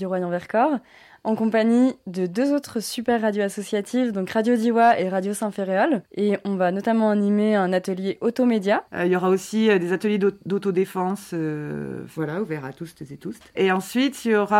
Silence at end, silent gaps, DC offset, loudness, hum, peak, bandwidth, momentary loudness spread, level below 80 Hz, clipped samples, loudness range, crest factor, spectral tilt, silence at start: 0 s; none; under 0.1%; -22 LUFS; none; -6 dBFS; 16 kHz; 10 LU; -66 dBFS; under 0.1%; 5 LU; 16 dB; -6 dB/octave; 0 s